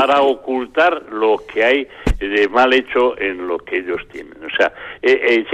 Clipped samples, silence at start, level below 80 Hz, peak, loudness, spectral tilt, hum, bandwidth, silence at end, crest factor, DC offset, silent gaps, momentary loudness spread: under 0.1%; 0 s; -34 dBFS; -2 dBFS; -17 LUFS; -5.5 dB/octave; none; 9.2 kHz; 0 s; 14 dB; under 0.1%; none; 10 LU